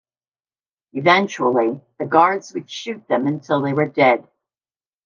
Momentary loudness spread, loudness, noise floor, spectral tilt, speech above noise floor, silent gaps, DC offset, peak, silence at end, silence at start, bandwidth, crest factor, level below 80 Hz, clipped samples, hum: 14 LU; -18 LUFS; under -90 dBFS; -5.5 dB/octave; over 72 dB; none; under 0.1%; 0 dBFS; 0.85 s; 0.95 s; 7.4 kHz; 20 dB; -70 dBFS; under 0.1%; none